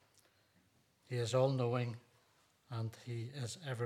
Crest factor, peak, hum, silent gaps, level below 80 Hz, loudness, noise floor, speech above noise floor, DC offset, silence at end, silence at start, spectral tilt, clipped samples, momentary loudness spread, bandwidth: 20 dB; -20 dBFS; none; none; -84 dBFS; -39 LUFS; -73 dBFS; 35 dB; under 0.1%; 0 s; 1.1 s; -6 dB/octave; under 0.1%; 12 LU; 13.5 kHz